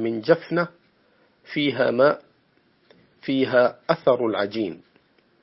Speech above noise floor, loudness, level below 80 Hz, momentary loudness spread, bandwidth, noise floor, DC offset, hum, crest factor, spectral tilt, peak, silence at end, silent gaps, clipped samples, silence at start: 41 dB; -22 LUFS; -70 dBFS; 12 LU; 5.8 kHz; -63 dBFS; under 0.1%; none; 22 dB; -9.5 dB/octave; -2 dBFS; 0.65 s; none; under 0.1%; 0 s